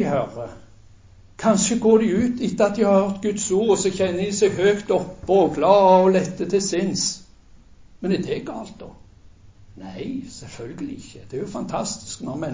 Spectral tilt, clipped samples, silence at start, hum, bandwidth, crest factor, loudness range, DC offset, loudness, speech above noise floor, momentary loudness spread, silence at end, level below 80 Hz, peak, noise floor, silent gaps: -5 dB/octave; under 0.1%; 0 s; none; 7.8 kHz; 18 dB; 13 LU; under 0.1%; -20 LUFS; 28 dB; 18 LU; 0 s; -50 dBFS; -2 dBFS; -48 dBFS; none